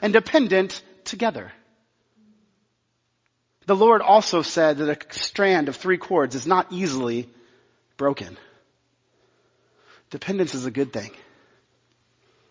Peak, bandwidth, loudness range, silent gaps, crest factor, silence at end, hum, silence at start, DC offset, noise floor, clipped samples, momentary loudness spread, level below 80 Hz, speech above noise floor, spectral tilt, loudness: -2 dBFS; 7.6 kHz; 11 LU; none; 22 dB; 1.4 s; none; 0 s; under 0.1%; -72 dBFS; under 0.1%; 18 LU; -66 dBFS; 51 dB; -4.5 dB/octave; -21 LUFS